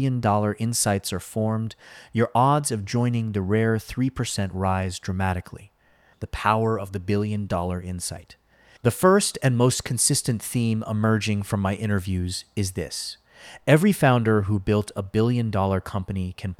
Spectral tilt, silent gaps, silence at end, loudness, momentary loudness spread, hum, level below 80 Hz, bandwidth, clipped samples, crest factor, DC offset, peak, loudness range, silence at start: -5 dB/octave; none; 0.05 s; -24 LUFS; 11 LU; none; -48 dBFS; 16 kHz; under 0.1%; 18 dB; under 0.1%; -4 dBFS; 5 LU; 0 s